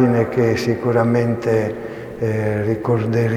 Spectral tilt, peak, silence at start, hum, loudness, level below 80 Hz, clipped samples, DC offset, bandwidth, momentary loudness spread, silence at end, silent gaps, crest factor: -8 dB/octave; -4 dBFS; 0 s; none; -19 LUFS; -48 dBFS; under 0.1%; under 0.1%; 14 kHz; 8 LU; 0 s; none; 14 dB